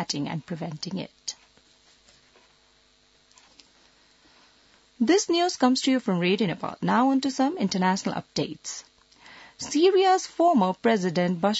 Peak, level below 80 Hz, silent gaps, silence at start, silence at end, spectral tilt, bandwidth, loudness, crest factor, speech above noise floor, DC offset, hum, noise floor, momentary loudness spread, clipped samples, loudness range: -8 dBFS; -68 dBFS; none; 0 s; 0 s; -4.5 dB/octave; 8 kHz; -24 LUFS; 18 dB; 38 dB; under 0.1%; none; -62 dBFS; 14 LU; under 0.1%; 15 LU